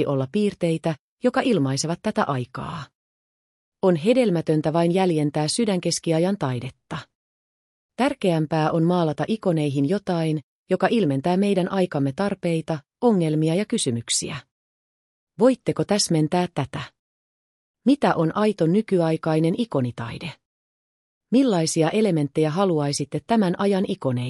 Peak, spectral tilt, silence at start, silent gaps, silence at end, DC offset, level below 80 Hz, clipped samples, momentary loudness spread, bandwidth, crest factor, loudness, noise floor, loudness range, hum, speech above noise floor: -6 dBFS; -5.5 dB/octave; 0 s; 0.99-1.17 s, 2.95-3.72 s, 7.15-7.89 s, 10.43-10.66 s, 14.51-15.27 s, 16.99-17.74 s, 20.45-21.21 s; 0 s; under 0.1%; -62 dBFS; under 0.1%; 10 LU; 12 kHz; 16 dB; -22 LUFS; under -90 dBFS; 3 LU; none; over 68 dB